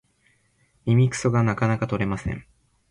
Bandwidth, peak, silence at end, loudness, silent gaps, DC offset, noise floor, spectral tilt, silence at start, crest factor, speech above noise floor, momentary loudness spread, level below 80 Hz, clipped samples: 10.5 kHz; -8 dBFS; 0.5 s; -23 LUFS; none; under 0.1%; -64 dBFS; -7 dB/octave; 0.85 s; 16 dB; 43 dB; 12 LU; -46 dBFS; under 0.1%